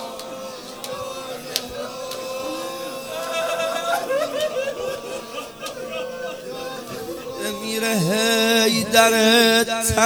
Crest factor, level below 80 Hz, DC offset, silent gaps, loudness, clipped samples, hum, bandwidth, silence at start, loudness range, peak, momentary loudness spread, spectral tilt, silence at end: 22 dB; -50 dBFS; under 0.1%; none; -21 LUFS; under 0.1%; none; over 20 kHz; 0 s; 11 LU; 0 dBFS; 17 LU; -2.5 dB/octave; 0 s